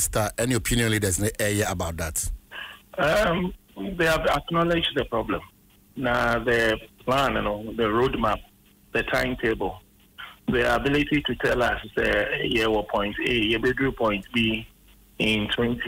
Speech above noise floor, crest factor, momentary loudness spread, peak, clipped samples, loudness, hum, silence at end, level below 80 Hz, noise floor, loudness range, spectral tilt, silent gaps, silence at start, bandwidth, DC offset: 30 dB; 14 dB; 10 LU; -10 dBFS; under 0.1%; -24 LUFS; none; 0 s; -40 dBFS; -54 dBFS; 2 LU; -4 dB/octave; none; 0 s; 16 kHz; under 0.1%